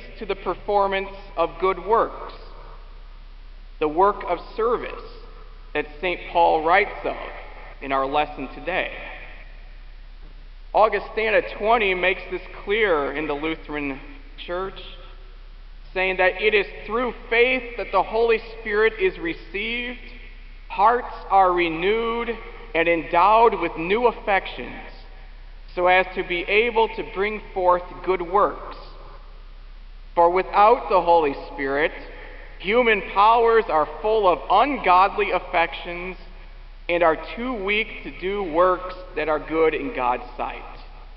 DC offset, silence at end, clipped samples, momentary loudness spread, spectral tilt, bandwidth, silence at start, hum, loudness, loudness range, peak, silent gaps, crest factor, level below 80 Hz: 0.1%; 0 s; under 0.1%; 17 LU; -8 dB/octave; 5.8 kHz; 0 s; none; -21 LUFS; 6 LU; -4 dBFS; none; 20 dB; -40 dBFS